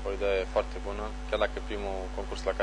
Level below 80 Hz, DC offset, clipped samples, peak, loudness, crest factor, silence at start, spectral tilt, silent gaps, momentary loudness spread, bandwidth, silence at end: -38 dBFS; under 0.1%; under 0.1%; -12 dBFS; -32 LUFS; 18 dB; 0 s; -5 dB/octave; none; 7 LU; 10.5 kHz; 0 s